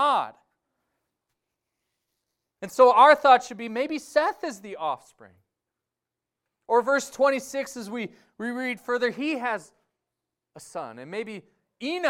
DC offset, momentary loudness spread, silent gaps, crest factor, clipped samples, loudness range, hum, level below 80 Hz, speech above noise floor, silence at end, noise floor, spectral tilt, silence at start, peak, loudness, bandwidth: under 0.1%; 20 LU; none; 22 dB; under 0.1%; 10 LU; none; -74 dBFS; 63 dB; 0 s; -87 dBFS; -3.5 dB/octave; 0 s; -4 dBFS; -23 LUFS; 16 kHz